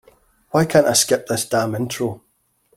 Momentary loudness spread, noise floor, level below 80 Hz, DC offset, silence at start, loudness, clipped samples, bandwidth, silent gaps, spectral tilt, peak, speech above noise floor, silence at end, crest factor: 11 LU; -63 dBFS; -56 dBFS; under 0.1%; 0.55 s; -19 LUFS; under 0.1%; 16.5 kHz; none; -3.5 dB/octave; -2 dBFS; 44 dB; 0.6 s; 18 dB